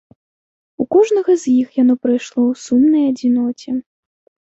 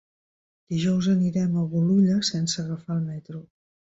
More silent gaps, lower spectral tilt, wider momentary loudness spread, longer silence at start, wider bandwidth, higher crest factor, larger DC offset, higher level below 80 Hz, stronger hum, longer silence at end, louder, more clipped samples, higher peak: neither; about the same, -5.5 dB/octave vs -6 dB/octave; second, 10 LU vs 13 LU; about the same, 0.8 s vs 0.7 s; about the same, 8 kHz vs 8 kHz; about the same, 14 dB vs 14 dB; neither; about the same, -62 dBFS vs -60 dBFS; neither; first, 0.7 s vs 0.55 s; first, -16 LUFS vs -24 LUFS; neither; first, -2 dBFS vs -10 dBFS